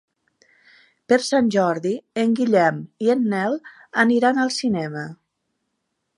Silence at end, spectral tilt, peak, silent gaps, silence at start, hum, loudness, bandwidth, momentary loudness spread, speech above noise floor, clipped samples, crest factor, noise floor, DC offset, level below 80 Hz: 1.05 s; -5 dB/octave; -4 dBFS; none; 1.1 s; none; -20 LUFS; 11.5 kHz; 9 LU; 56 dB; under 0.1%; 18 dB; -76 dBFS; under 0.1%; -66 dBFS